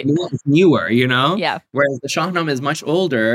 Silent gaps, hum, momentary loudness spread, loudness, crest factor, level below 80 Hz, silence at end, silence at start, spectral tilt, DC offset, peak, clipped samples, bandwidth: none; none; 7 LU; -17 LUFS; 14 dB; -62 dBFS; 0 s; 0 s; -5.5 dB/octave; under 0.1%; -2 dBFS; under 0.1%; 15.5 kHz